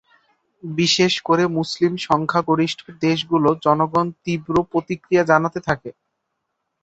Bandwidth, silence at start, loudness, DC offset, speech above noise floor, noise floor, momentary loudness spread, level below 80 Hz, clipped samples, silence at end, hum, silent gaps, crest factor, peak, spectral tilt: 8.2 kHz; 0.65 s; -19 LUFS; under 0.1%; 57 dB; -76 dBFS; 8 LU; -56 dBFS; under 0.1%; 0.9 s; none; none; 20 dB; -2 dBFS; -5 dB/octave